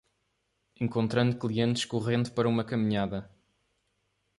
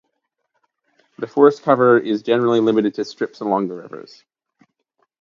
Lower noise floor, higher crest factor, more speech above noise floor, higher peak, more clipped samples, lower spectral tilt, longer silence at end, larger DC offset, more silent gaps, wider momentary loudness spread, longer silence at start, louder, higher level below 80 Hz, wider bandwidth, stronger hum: about the same, -77 dBFS vs -74 dBFS; about the same, 18 dB vs 20 dB; second, 49 dB vs 56 dB; second, -14 dBFS vs 0 dBFS; neither; about the same, -6.5 dB/octave vs -7 dB/octave; about the same, 1.1 s vs 1.2 s; neither; neither; second, 6 LU vs 18 LU; second, 0.8 s vs 1.2 s; second, -29 LUFS vs -17 LUFS; first, -60 dBFS vs -70 dBFS; first, 11.5 kHz vs 7.4 kHz; neither